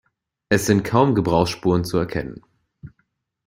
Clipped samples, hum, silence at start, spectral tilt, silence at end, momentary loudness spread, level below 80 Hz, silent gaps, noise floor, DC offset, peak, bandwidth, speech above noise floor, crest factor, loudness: under 0.1%; none; 0.5 s; -6 dB/octave; 0.6 s; 9 LU; -46 dBFS; none; -70 dBFS; under 0.1%; -2 dBFS; 16 kHz; 51 dB; 20 dB; -20 LUFS